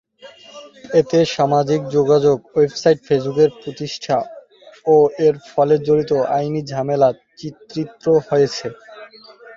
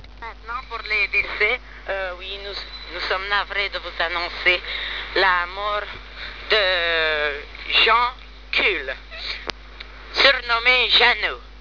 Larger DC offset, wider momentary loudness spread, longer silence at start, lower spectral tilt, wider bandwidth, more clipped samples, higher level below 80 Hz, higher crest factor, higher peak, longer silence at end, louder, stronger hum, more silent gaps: second, under 0.1% vs 0.3%; second, 13 LU vs 17 LU; first, 0.25 s vs 0 s; first, -6.5 dB/octave vs -3 dB/octave; first, 7.4 kHz vs 5.4 kHz; neither; second, -56 dBFS vs -42 dBFS; second, 16 dB vs 22 dB; about the same, -2 dBFS vs 0 dBFS; about the same, 0 s vs 0 s; first, -17 LUFS vs -20 LUFS; neither; neither